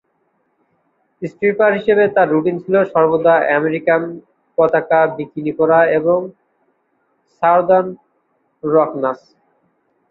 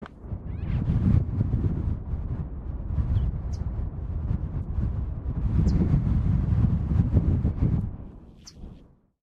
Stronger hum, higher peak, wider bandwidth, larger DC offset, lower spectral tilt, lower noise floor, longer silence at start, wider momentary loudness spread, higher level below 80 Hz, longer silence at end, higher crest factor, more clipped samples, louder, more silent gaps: neither; first, -2 dBFS vs -8 dBFS; second, 5.2 kHz vs 6.8 kHz; neither; about the same, -9 dB/octave vs -10 dB/octave; first, -64 dBFS vs -51 dBFS; first, 1.2 s vs 0 s; about the same, 14 LU vs 14 LU; second, -62 dBFS vs -30 dBFS; first, 0.95 s vs 0.45 s; about the same, 16 dB vs 18 dB; neither; first, -15 LUFS vs -27 LUFS; neither